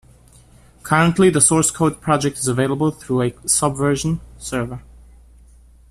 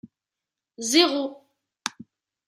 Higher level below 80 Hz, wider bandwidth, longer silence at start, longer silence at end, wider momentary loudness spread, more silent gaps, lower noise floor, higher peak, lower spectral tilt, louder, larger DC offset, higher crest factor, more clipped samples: first, -44 dBFS vs -82 dBFS; about the same, 14.5 kHz vs 15.5 kHz; about the same, 0.85 s vs 0.8 s; first, 1.1 s vs 0.6 s; about the same, 13 LU vs 15 LU; neither; second, -48 dBFS vs -88 dBFS; first, 0 dBFS vs -4 dBFS; first, -4.5 dB/octave vs -1 dB/octave; first, -18 LUFS vs -24 LUFS; neither; about the same, 20 dB vs 24 dB; neither